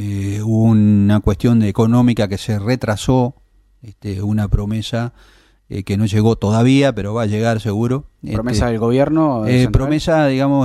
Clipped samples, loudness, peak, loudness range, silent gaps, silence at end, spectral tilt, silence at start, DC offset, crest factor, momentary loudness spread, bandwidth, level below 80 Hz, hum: under 0.1%; -16 LUFS; -2 dBFS; 5 LU; none; 0 s; -7.5 dB/octave; 0 s; under 0.1%; 14 dB; 10 LU; 12.5 kHz; -32 dBFS; none